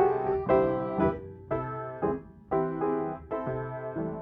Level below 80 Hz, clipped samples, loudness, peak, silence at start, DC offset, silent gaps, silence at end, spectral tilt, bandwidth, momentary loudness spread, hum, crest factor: -52 dBFS; under 0.1%; -30 LUFS; -10 dBFS; 0 s; under 0.1%; none; 0 s; -11 dB/octave; 4.7 kHz; 10 LU; none; 18 dB